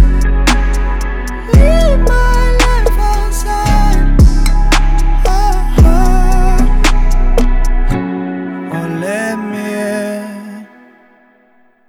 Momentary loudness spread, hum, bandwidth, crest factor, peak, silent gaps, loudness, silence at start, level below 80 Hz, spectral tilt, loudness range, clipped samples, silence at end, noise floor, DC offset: 10 LU; none; 13.5 kHz; 10 dB; 0 dBFS; none; -14 LUFS; 0 s; -10 dBFS; -5.5 dB/octave; 7 LU; under 0.1%; 1.25 s; -50 dBFS; under 0.1%